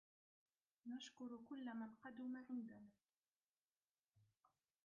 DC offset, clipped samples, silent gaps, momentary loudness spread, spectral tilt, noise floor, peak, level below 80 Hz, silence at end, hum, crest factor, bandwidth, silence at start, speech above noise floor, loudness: under 0.1%; under 0.1%; 3.17-3.23 s, 3.45-3.54 s, 3.91-4.04 s; 10 LU; -3.5 dB/octave; under -90 dBFS; -42 dBFS; under -90 dBFS; 0.6 s; none; 14 dB; 6.6 kHz; 0.85 s; over 36 dB; -54 LUFS